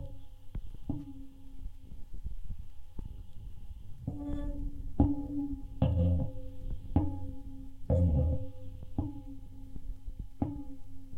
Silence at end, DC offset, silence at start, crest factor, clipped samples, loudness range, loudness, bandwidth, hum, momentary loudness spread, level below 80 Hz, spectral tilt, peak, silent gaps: 0 s; under 0.1%; 0 s; 20 dB; under 0.1%; 14 LU; -35 LUFS; 3.7 kHz; none; 21 LU; -40 dBFS; -10.5 dB/octave; -14 dBFS; none